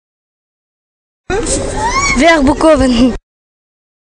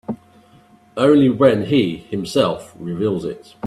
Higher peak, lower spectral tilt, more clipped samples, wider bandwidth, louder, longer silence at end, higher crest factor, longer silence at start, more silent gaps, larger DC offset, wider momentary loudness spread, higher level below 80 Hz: about the same, 0 dBFS vs 0 dBFS; second, -4 dB/octave vs -7 dB/octave; neither; second, 11 kHz vs 12.5 kHz; first, -11 LUFS vs -17 LUFS; first, 0.95 s vs 0 s; about the same, 14 dB vs 18 dB; first, 1.3 s vs 0.1 s; neither; neither; second, 10 LU vs 17 LU; first, -26 dBFS vs -54 dBFS